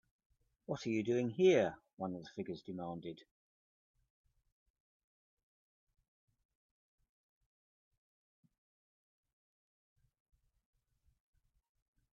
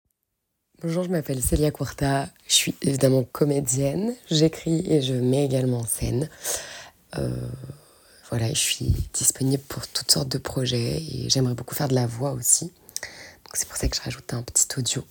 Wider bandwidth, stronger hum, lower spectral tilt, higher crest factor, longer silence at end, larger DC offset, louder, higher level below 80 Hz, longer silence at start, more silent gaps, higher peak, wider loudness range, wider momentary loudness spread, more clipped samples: second, 7.2 kHz vs 19 kHz; neither; first, -5.5 dB/octave vs -4 dB/octave; about the same, 24 dB vs 24 dB; first, 8.95 s vs 0.1 s; neither; second, -37 LUFS vs -24 LUFS; second, -80 dBFS vs -40 dBFS; about the same, 0.7 s vs 0.8 s; first, 1.93-1.97 s vs none; second, -18 dBFS vs -2 dBFS; first, 16 LU vs 4 LU; first, 16 LU vs 12 LU; neither